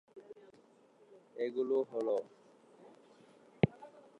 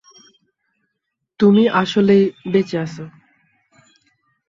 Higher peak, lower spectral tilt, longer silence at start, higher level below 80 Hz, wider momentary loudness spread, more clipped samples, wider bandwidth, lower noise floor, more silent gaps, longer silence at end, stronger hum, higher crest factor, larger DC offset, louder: second, -10 dBFS vs -2 dBFS; first, -8.5 dB/octave vs -7 dB/octave; second, 0.15 s vs 1.4 s; second, -70 dBFS vs -60 dBFS; first, 22 LU vs 16 LU; neither; first, 8.8 kHz vs 7.4 kHz; second, -65 dBFS vs -77 dBFS; neither; second, 0.2 s vs 1.4 s; neither; first, 28 dB vs 18 dB; neither; second, -36 LUFS vs -16 LUFS